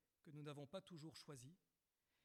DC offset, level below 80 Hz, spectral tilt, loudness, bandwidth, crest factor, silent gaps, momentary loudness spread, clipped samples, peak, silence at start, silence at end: under 0.1%; under -90 dBFS; -5.5 dB/octave; -58 LUFS; 14 kHz; 18 dB; none; 7 LU; under 0.1%; -42 dBFS; 0.25 s; 0.7 s